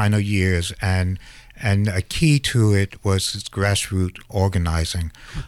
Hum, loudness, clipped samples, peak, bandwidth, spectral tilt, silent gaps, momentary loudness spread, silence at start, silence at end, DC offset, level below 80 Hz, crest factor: none; -21 LUFS; under 0.1%; -6 dBFS; 14.5 kHz; -5 dB/octave; none; 8 LU; 0 s; 0 s; under 0.1%; -36 dBFS; 16 dB